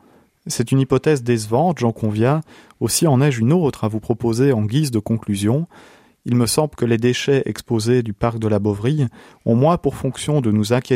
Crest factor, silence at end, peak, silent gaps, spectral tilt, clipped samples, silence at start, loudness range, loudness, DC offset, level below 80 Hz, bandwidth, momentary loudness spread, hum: 16 dB; 0 s; -2 dBFS; none; -6 dB/octave; under 0.1%; 0.45 s; 2 LU; -19 LUFS; under 0.1%; -48 dBFS; 16 kHz; 7 LU; none